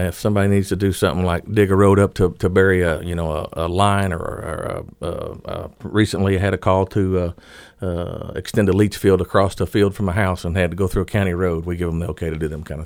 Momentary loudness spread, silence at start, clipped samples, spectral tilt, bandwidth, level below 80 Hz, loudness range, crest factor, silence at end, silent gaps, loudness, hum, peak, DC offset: 12 LU; 0 s; under 0.1%; -6.5 dB/octave; 16 kHz; -36 dBFS; 4 LU; 18 dB; 0 s; none; -19 LUFS; none; -2 dBFS; under 0.1%